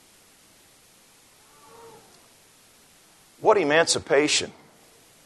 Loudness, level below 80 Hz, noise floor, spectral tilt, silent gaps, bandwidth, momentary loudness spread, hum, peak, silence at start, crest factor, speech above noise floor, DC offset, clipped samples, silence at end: -21 LUFS; -70 dBFS; -56 dBFS; -2 dB/octave; none; 12.5 kHz; 6 LU; none; -4 dBFS; 3.4 s; 24 dB; 35 dB; under 0.1%; under 0.1%; 0.75 s